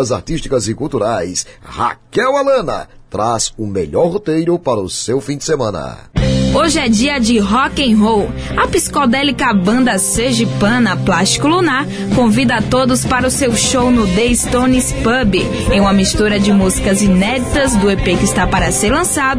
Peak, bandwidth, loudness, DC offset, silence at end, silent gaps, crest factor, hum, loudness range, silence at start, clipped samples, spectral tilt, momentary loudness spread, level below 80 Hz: -2 dBFS; 11 kHz; -13 LUFS; under 0.1%; 0 s; none; 12 dB; none; 4 LU; 0 s; under 0.1%; -4.5 dB/octave; 6 LU; -28 dBFS